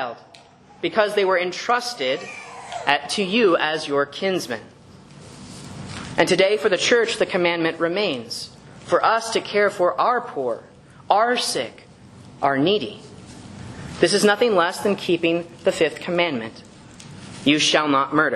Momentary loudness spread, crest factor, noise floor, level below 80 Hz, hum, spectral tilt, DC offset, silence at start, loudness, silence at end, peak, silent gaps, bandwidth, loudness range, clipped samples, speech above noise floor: 19 LU; 22 dB; -45 dBFS; -58 dBFS; none; -3.5 dB/octave; under 0.1%; 0 s; -20 LUFS; 0 s; 0 dBFS; none; 12.5 kHz; 3 LU; under 0.1%; 24 dB